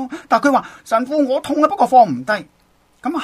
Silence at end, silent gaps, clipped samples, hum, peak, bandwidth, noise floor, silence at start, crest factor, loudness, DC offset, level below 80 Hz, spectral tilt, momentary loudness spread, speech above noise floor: 0 s; none; under 0.1%; none; 0 dBFS; 14.5 kHz; -56 dBFS; 0 s; 16 dB; -16 LUFS; under 0.1%; -60 dBFS; -5 dB/octave; 10 LU; 40 dB